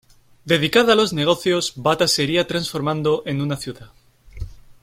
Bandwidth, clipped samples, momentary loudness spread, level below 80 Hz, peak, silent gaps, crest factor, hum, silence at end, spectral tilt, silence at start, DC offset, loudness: 16.5 kHz; under 0.1%; 18 LU; -46 dBFS; -2 dBFS; none; 18 dB; none; 0.1 s; -4 dB/octave; 0.45 s; under 0.1%; -19 LUFS